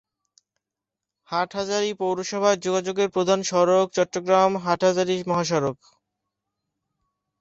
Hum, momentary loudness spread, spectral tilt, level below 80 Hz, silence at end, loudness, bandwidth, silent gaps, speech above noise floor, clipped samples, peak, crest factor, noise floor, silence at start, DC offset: none; 7 LU; -4.5 dB/octave; -66 dBFS; 1.65 s; -23 LUFS; 8 kHz; none; 65 dB; under 0.1%; -6 dBFS; 18 dB; -87 dBFS; 1.3 s; under 0.1%